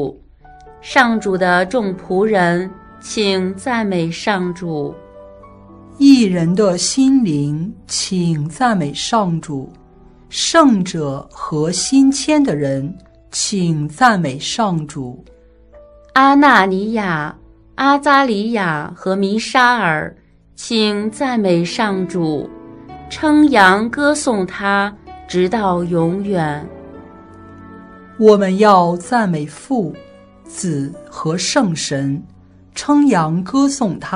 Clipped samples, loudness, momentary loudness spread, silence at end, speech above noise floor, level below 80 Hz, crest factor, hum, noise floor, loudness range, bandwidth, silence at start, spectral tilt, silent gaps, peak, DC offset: under 0.1%; -15 LUFS; 15 LU; 0 s; 29 dB; -48 dBFS; 16 dB; none; -44 dBFS; 5 LU; 11 kHz; 0 s; -4.5 dB/octave; none; 0 dBFS; under 0.1%